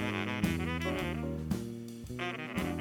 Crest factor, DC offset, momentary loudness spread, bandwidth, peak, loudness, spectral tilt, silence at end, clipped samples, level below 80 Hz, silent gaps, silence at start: 18 dB; under 0.1%; 8 LU; 19.5 kHz; -16 dBFS; -36 LUFS; -6 dB/octave; 0 s; under 0.1%; -50 dBFS; none; 0 s